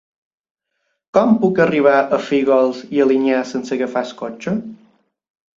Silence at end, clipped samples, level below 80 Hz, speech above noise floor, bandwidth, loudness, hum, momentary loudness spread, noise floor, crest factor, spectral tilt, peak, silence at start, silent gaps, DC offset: 0.8 s; under 0.1%; -62 dBFS; 56 dB; 7.6 kHz; -17 LUFS; none; 10 LU; -72 dBFS; 18 dB; -6.5 dB/octave; 0 dBFS; 1.15 s; none; under 0.1%